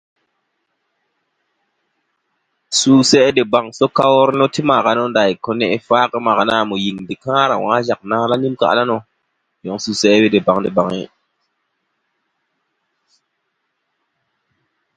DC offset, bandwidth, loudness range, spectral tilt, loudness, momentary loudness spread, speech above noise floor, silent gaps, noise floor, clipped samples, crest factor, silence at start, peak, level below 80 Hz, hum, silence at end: under 0.1%; 9.4 kHz; 5 LU; -4 dB/octave; -15 LUFS; 10 LU; 57 dB; none; -71 dBFS; under 0.1%; 18 dB; 2.7 s; 0 dBFS; -58 dBFS; none; 3.9 s